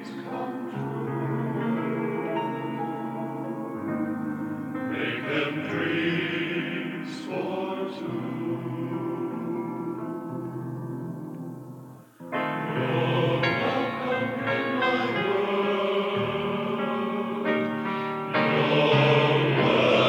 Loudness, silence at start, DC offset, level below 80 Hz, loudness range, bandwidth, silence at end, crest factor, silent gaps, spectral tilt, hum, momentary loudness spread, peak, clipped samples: -27 LUFS; 0 s; under 0.1%; -70 dBFS; 8 LU; 17.5 kHz; 0 s; 18 dB; none; -7 dB/octave; none; 12 LU; -8 dBFS; under 0.1%